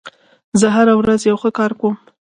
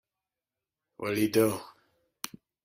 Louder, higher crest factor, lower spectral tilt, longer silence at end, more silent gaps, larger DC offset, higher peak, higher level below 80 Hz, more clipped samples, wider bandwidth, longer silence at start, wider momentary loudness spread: first, -15 LUFS vs -29 LUFS; about the same, 16 dB vs 20 dB; about the same, -5.5 dB/octave vs -5 dB/octave; about the same, 0.3 s vs 0.35 s; first, 0.44-0.52 s vs none; neither; first, 0 dBFS vs -12 dBFS; first, -52 dBFS vs -68 dBFS; neither; second, 11 kHz vs 16 kHz; second, 0.05 s vs 1 s; second, 8 LU vs 16 LU